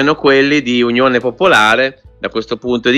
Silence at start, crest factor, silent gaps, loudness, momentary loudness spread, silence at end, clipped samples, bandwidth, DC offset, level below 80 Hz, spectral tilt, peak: 0 s; 12 dB; none; -12 LUFS; 11 LU; 0 s; under 0.1%; 13.5 kHz; under 0.1%; -46 dBFS; -4.5 dB/octave; 0 dBFS